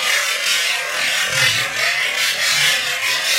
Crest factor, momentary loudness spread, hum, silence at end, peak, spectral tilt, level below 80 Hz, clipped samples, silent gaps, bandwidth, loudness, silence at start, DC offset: 16 dB; 3 LU; none; 0 s; -2 dBFS; 1 dB/octave; -60 dBFS; under 0.1%; none; 16 kHz; -16 LUFS; 0 s; under 0.1%